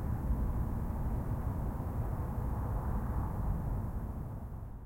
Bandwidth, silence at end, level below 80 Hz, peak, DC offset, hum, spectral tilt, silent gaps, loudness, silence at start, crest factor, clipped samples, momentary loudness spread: 16.5 kHz; 0 s; -38 dBFS; -22 dBFS; under 0.1%; none; -9.5 dB/octave; none; -38 LUFS; 0 s; 12 dB; under 0.1%; 6 LU